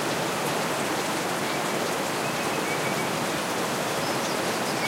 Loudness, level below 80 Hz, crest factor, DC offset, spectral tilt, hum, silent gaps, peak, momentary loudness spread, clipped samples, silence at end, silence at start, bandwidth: -26 LUFS; -62 dBFS; 14 dB; under 0.1%; -3 dB/octave; none; none; -14 dBFS; 1 LU; under 0.1%; 0 s; 0 s; 16 kHz